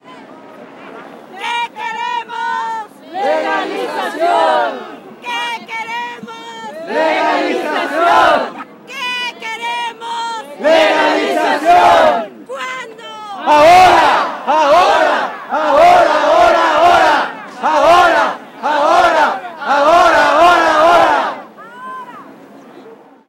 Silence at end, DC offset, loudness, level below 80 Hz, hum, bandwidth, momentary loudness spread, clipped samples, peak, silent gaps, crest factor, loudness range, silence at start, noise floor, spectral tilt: 0.35 s; under 0.1%; -12 LUFS; -48 dBFS; none; 16 kHz; 19 LU; under 0.1%; 0 dBFS; none; 12 dB; 8 LU; 0.1 s; -39 dBFS; -3 dB/octave